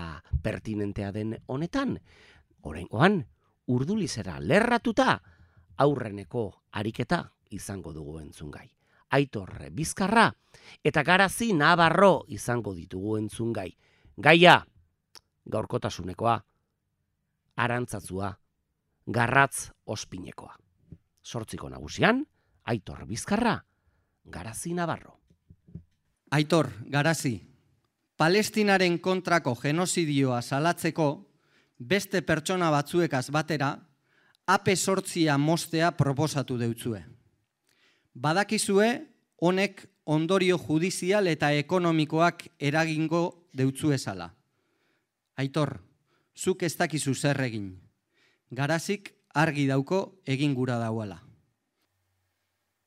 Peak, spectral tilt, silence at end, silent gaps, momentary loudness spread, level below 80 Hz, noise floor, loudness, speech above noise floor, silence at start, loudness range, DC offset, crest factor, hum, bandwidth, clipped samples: -2 dBFS; -5 dB/octave; 1.7 s; none; 17 LU; -54 dBFS; -79 dBFS; -27 LUFS; 52 dB; 0 s; 8 LU; under 0.1%; 26 dB; none; 16 kHz; under 0.1%